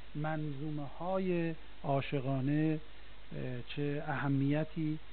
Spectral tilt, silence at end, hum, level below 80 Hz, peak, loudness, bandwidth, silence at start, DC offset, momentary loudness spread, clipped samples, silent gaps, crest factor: -7 dB/octave; 0 s; none; -58 dBFS; -20 dBFS; -36 LUFS; 4.5 kHz; 0 s; 0.8%; 10 LU; under 0.1%; none; 16 dB